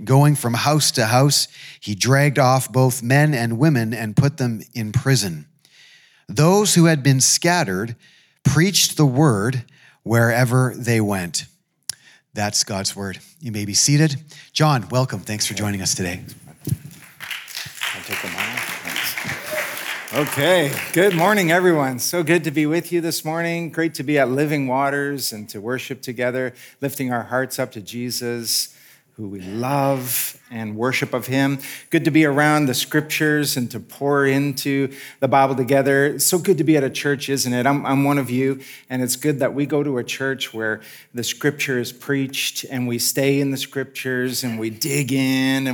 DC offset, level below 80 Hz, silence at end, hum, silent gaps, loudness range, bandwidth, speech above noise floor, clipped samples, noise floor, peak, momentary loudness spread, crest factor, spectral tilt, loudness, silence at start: under 0.1%; -62 dBFS; 0 s; none; none; 7 LU; over 20 kHz; 31 dB; under 0.1%; -51 dBFS; -4 dBFS; 13 LU; 16 dB; -4.5 dB/octave; -19 LUFS; 0 s